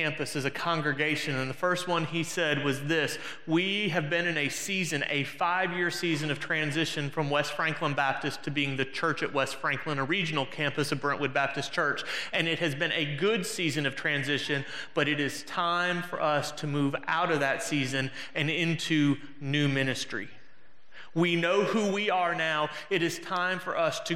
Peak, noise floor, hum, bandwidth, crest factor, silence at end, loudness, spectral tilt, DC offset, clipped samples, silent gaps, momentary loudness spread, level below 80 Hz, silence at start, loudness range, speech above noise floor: -10 dBFS; -62 dBFS; none; 16 kHz; 20 dB; 0 s; -29 LUFS; -4.5 dB/octave; 0.5%; under 0.1%; none; 4 LU; -72 dBFS; 0 s; 1 LU; 32 dB